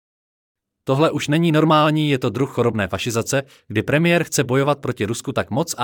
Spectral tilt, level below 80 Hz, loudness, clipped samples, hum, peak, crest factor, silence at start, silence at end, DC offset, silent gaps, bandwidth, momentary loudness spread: -5.5 dB/octave; -58 dBFS; -19 LUFS; under 0.1%; none; -4 dBFS; 16 dB; 0.85 s; 0 s; under 0.1%; none; 18.5 kHz; 9 LU